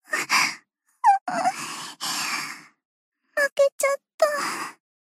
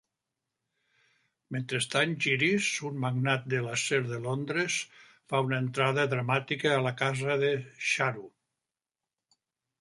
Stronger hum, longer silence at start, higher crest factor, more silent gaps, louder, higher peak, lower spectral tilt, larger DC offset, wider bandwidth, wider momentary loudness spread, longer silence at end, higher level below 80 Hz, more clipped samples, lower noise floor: neither; second, 0.1 s vs 1.5 s; about the same, 18 dB vs 20 dB; first, 1.21-1.26 s, 2.85-3.12 s, 3.52-3.56 s, 3.72-3.79 s, 4.14-4.18 s vs none; first, -24 LUFS vs -29 LUFS; first, -8 dBFS vs -12 dBFS; second, -0.5 dB/octave vs -4.5 dB/octave; neither; first, 15.5 kHz vs 11.5 kHz; first, 12 LU vs 7 LU; second, 0.3 s vs 1.5 s; second, -88 dBFS vs -72 dBFS; neither; second, -52 dBFS vs under -90 dBFS